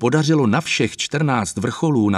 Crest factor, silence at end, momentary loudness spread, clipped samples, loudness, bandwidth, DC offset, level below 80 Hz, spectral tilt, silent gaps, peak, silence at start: 14 dB; 0 s; 5 LU; under 0.1%; -19 LUFS; 12.5 kHz; under 0.1%; -54 dBFS; -5.5 dB/octave; none; -4 dBFS; 0 s